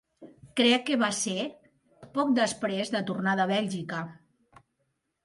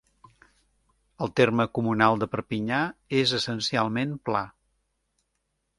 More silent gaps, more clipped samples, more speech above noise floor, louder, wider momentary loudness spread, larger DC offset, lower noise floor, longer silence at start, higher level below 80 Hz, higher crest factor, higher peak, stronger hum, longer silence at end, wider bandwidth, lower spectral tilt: neither; neither; about the same, 50 dB vs 52 dB; about the same, -28 LUFS vs -26 LUFS; first, 12 LU vs 7 LU; neither; about the same, -78 dBFS vs -77 dBFS; second, 0.2 s vs 1.2 s; second, -72 dBFS vs -60 dBFS; about the same, 18 dB vs 22 dB; second, -10 dBFS vs -4 dBFS; neither; second, 1.1 s vs 1.3 s; about the same, 11.5 kHz vs 11.5 kHz; second, -4 dB/octave vs -5.5 dB/octave